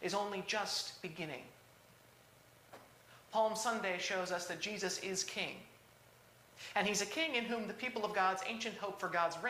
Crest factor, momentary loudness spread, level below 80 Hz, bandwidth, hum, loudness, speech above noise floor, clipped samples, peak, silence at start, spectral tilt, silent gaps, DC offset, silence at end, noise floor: 20 dB; 14 LU; -78 dBFS; 15.5 kHz; 60 Hz at -70 dBFS; -38 LUFS; 25 dB; under 0.1%; -20 dBFS; 0 s; -2.5 dB/octave; none; under 0.1%; 0 s; -64 dBFS